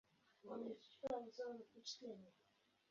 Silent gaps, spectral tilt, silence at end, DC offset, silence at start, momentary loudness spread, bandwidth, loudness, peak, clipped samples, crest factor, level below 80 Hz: none; -3 dB/octave; 0.6 s; under 0.1%; 0.45 s; 12 LU; 7.2 kHz; -52 LUFS; -34 dBFS; under 0.1%; 20 dB; -88 dBFS